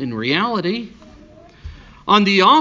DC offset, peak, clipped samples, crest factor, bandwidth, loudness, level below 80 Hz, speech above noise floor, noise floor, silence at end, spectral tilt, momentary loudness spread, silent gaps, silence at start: under 0.1%; 0 dBFS; under 0.1%; 18 dB; 7.6 kHz; -16 LUFS; -44 dBFS; 28 dB; -44 dBFS; 0 s; -5 dB/octave; 18 LU; none; 0 s